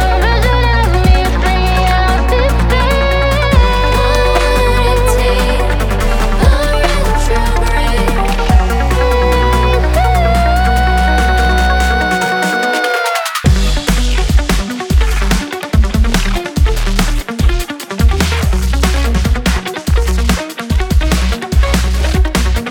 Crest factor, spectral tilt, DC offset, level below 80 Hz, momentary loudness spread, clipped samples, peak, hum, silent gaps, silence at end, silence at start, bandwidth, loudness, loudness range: 10 dB; -5 dB/octave; under 0.1%; -14 dBFS; 4 LU; under 0.1%; 0 dBFS; none; none; 0 s; 0 s; 18.5 kHz; -13 LUFS; 3 LU